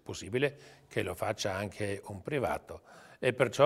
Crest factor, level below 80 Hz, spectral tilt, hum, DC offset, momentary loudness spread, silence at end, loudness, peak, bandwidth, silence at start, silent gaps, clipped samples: 24 dB; -62 dBFS; -5 dB/octave; none; under 0.1%; 16 LU; 0 s; -34 LUFS; -10 dBFS; 16 kHz; 0.05 s; none; under 0.1%